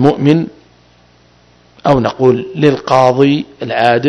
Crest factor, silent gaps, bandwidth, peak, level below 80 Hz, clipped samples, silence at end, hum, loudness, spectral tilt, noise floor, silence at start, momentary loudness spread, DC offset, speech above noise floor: 12 dB; none; 10.5 kHz; 0 dBFS; -44 dBFS; 0.8%; 0 s; 60 Hz at -40 dBFS; -12 LUFS; -7.5 dB/octave; -48 dBFS; 0 s; 8 LU; under 0.1%; 36 dB